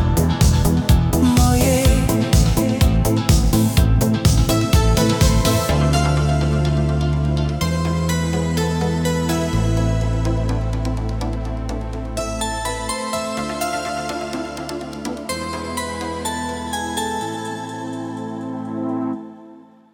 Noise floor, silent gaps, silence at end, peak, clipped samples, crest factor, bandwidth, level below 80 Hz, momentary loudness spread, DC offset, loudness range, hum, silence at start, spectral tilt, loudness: -44 dBFS; none; 0.35 s; -4 dBFS; under 0.1%; 14 dB; 19 kHz; -24 dBFS; 12 LU; under 0.1%; 9 LU; none; 0 s; -5.5 dB/octave; -19 LUFS